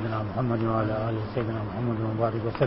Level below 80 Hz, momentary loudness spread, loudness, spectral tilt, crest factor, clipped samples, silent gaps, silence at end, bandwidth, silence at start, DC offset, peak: -48 dBFS; 4 LU; -28 LUFS; -12 dB/octave; 16 dB; under 0.1%; none; 0 s; 5.8 kHz; 0 s; 0.1%; -10 dBFS